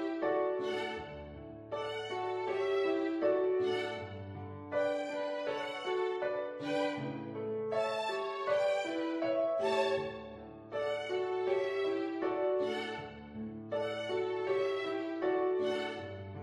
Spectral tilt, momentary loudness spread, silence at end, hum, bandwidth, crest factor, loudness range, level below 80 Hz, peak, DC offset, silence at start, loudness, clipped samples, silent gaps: -5.5 dB/octave; 12 LU; 0 s; none; 10.5 kHz; 16 dB; 2 LU; -68 dBFS; -20 dBFS; under 0.1%; 0 s; -35 LUFS; under 0.1%; none